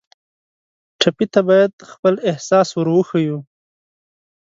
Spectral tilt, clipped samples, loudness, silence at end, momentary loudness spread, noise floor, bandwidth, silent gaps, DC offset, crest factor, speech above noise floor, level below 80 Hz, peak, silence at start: -5.5 dB/octave; under 0.1%; -17 LUFS; 1.1 s; 6 LU; under -90 dBFS; 7.8 kHz; 1.73-1.78 s, 1.99-2.03 s; under 0.1%; 18 dB; over 74 dB; -64 dBFS; 0 dBFS; 1 s